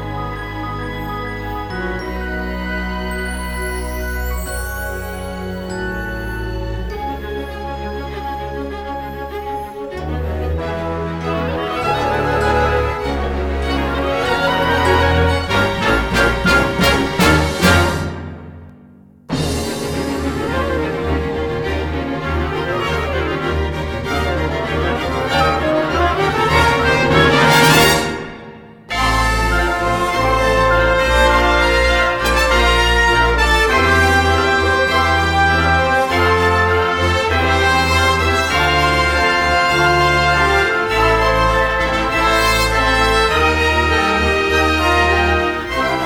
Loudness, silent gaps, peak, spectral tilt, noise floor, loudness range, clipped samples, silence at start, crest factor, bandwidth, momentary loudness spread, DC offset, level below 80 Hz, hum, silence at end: -16 LUFS; none; 0 dBFS; -4.5 dB/octave; -44 dBFS; 11 LU; under 0.1%; 0 s; 16 dB; over 20 kHz; 12 LU; under 0.1%; -26 dBFS; none; 0 s